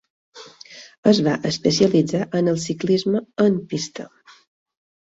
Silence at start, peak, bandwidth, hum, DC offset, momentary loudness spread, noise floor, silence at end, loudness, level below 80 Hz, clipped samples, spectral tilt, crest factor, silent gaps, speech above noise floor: 0.35 s; -2 dBFS; 8 kHz; none; under 0.1%; 23 LU; -44 dBFS; 1 s; -20 LUFS; -58 dBFS; under 0.1%; -5.5 dB/octave; 18 dB; 0.98-1.03 s; 25 dB